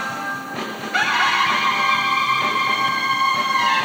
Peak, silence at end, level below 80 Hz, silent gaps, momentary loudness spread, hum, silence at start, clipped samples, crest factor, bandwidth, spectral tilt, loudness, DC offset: -6 dBFS; 0 s; -72 dBFS; none; 10 LU; none; 0 s; under 0.1%; 14 dB; over 20 kHz; -1.5 dB/octave; -18 LUFS; under 0.1%